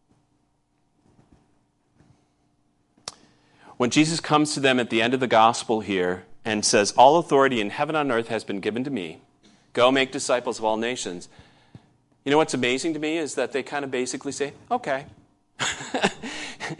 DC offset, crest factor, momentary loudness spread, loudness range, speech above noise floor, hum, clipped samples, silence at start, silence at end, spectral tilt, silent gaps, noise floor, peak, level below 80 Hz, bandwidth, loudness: under 0.1%; 22 dB; 14 LU; 8 LU; 46 dB; none; under 0.1%; 3.05 s; 0.05 s; -3.5 dB/octave; none; -68 dBFS; -2 dBFS; -64 dBFS; 11.5 kHz; -23 LUFS